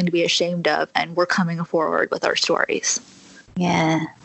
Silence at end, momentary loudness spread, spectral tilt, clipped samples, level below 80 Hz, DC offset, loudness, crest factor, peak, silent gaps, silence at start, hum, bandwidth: 0.1 s; 4 LU; -3.5 dB/octave; under 0.1%; -62 dBFS; under 0.1%; -21 LUFS; 20 dB; -2 dBFS; none; 0 s; none; 8.4 kHz